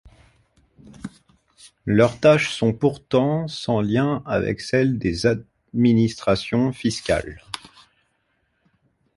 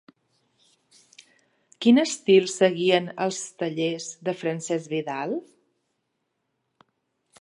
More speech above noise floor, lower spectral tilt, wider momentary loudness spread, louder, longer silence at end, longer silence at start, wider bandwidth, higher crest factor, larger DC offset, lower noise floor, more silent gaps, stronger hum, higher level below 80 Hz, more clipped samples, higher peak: second, 49 dB vs 54 dB; first, -6.5 dB/octave vs -4.5 dB/octave; first, 17 LU vs 11 LU; first, -21 LUFS vs -24 LUFS; second, 1.6 s vs 2 s; second, 1.05 s vs 1.8 s; about the same, 11.5 kHz vs 11 kHz; about the same, 20 dB vs 22 dB; neither; second, -69 dBFS vs -77 dBFS; neither; neither; first, -48 dBFS vs -78 dBFS; neither; first, -2 dBFS vs -6 dBFS